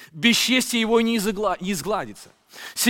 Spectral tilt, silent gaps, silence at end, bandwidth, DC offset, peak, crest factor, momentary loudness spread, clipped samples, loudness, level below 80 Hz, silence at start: -3 dB/octave; none; 0 s; 17 kHz; under 0.1%; -2 dBFS; 20 dB; 14 LU; under 0.1%; -21 LUFS; -52 dBFS; 0 s